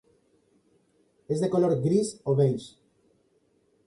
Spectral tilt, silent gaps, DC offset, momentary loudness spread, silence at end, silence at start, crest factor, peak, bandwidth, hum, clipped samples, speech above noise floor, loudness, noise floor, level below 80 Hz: -7.5 dB/octave; none; under 0.1%; 10 LU; 1.2 s; 1.3 s; 16 dB; -12 dBFS; 11.5 kHz; none; under 0.1%; 43 dB; -26 LUFS; -68 dBFS; -66 dBFS